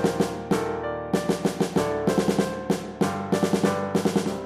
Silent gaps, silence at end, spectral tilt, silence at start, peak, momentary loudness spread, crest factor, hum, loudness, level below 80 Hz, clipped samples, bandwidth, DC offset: none; 0 s; -6 dB/octave; 0 s; -8 dBFS; 4 LU; 16 dB; none; -25 LUFS; -52 dBFS; under 0.1%; 15.5 kHz; under 0.1%